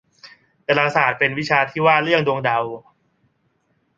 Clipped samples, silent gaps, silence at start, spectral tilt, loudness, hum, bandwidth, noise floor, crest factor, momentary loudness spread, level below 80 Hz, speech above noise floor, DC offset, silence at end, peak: under 0.1%; none; 0.25 s; -5.5 dB/octave; -18 LUFS; none; 7.8 kHz; -66 dBFS; 20 dB; 11 LU; -60 dBFS; 48 dB; under 0.1%; 1.2 s; -2 dBFS